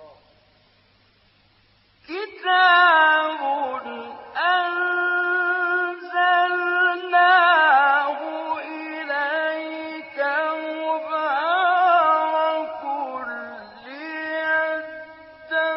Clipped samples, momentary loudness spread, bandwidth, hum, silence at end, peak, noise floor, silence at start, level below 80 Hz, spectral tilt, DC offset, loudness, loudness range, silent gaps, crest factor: under 0.1%; 17 LU; 5.8 kHz; none; 0 s; -6 dBFS; -59 dBFS; 0 s; -74 dBFS; 2.5 dB/octave; under 0.1%; -20 LUFS; 7 LU; none; 16 dB